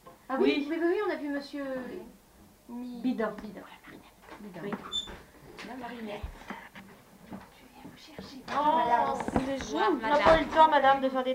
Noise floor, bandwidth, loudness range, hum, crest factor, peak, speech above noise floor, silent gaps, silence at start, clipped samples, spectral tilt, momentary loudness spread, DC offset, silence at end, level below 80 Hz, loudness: -58 dBFS; 16 kHz; 15 LU; none; 22 dB; -8 dBFS; 29 dB; none; 0.05 s; under 0.1%; -5 dB/octave; 25 LU; under 0.1%; 0 s; -52 dBFS; -28 LUFS